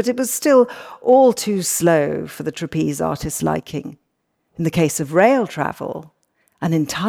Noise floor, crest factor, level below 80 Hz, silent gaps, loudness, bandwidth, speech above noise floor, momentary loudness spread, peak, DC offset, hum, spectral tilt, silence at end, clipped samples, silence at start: -70 dBFS; 16 dB; -50 dBFS; none; -18 LUFS; 18.5 kHz; 53 dB; 13 LU; -4 dBFS; under 0.1%; none; -5 dB/octave; 0 s; under 0.1%; 0 s